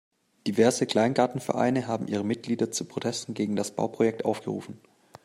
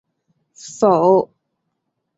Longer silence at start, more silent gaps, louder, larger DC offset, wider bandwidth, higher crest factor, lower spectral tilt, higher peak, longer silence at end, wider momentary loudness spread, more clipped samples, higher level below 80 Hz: second, 0.45 s vs 0.65 s; neither; second, -27 LUFS vs -15 LUFS; neither; first, 15.5 kHz vs 8 kHz; about the same, 20 dB vs 18 dB; second, -5 dB/octave vs -6.5 dB/octave; second, -8 dBFS vs -2 dBFS; second, 0.5 s vs 0.95 s; second, 9 LU vs 22 LU; neither; about the same, -70 dBFS vs -66 dBFS